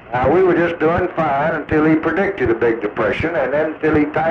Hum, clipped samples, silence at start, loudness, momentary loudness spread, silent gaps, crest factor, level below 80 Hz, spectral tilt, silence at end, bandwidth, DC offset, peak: none; under 0.1%; 0.05 s; -17 LUFS; 4 LU; none; 10 dB; -40 dBFS; -8.5 dB/octave; 0 s; 6.6 kHz; under 0.1%; -6 dBFS